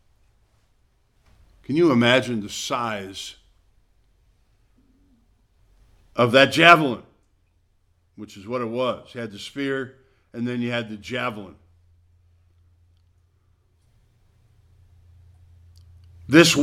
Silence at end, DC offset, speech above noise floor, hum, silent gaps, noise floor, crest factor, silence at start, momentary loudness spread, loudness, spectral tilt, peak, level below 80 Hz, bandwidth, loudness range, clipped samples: 0 s; under 0.1%; 43 dB; none; none; -64 dBFS; 24 dB; 1.7 s; 24 LU; -20 LUFS; -4.5 dB/octave; 0 dBFS; -60 dBFS; 15.5 kHz; 14 LU; under 0.1%